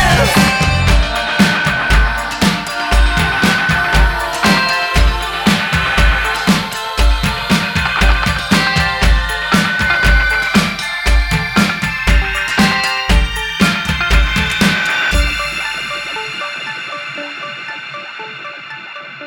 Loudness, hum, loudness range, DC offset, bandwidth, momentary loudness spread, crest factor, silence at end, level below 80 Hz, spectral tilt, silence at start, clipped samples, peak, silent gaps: -14 LUFS; none; 4 LU; under 0.1%; 18.5 kHz; 11 LU; 14 dB; 0 s; -18 dBFS; -4 dB/octave; 0 s; under 0.1%; 0 dBFS; none